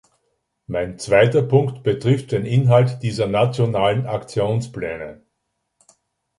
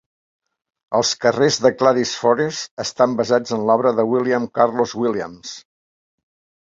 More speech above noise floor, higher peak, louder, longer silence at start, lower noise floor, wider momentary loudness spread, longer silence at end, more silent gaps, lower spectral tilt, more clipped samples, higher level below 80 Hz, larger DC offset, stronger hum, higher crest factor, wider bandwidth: second, 56 dB vs over 72 dB; about the same, -2 dBFS vs -2 dBFS; about the same, -19 LUFS vs -18 LUFS; second, 0.7 s vs 0.9 s; second, -75 dBFS vs under -90 dBFS; about the same, 13 LU vs 11 LU; first, 1.25 s vs 1.05 s; second, none vs 2.71-2.77 s; first, -7 dB/octave vs -4 dB/octave; neither; first, -50 dBFS vs -62 dBFS; neither; neither; about the same, 18 dB vs 18 dB; first, 11.5 kHz vs 7.8 kHz